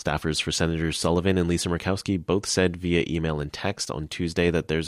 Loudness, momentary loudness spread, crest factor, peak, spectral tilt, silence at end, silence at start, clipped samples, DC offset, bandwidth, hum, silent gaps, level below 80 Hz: -25 LUFS; 6 LU; 16 dB; -8 dBFS; -5 dB/octave; 0 s; 0 s; under 0.1%; under 0.1%; 15.5 kHz; none; none; -42 dBFS